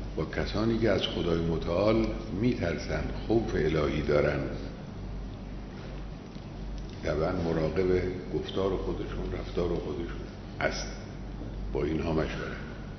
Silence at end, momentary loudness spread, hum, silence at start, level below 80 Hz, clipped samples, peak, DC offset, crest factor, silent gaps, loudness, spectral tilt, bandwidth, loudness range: 0 s; 14 LU; none; 0 s; -40 dBFS; under 0.1%; -12 dBFS; under 0.1%; 20 dB; none; -31 LUFS; -6.5 dB/octave; 6.4 kHz; 6 LU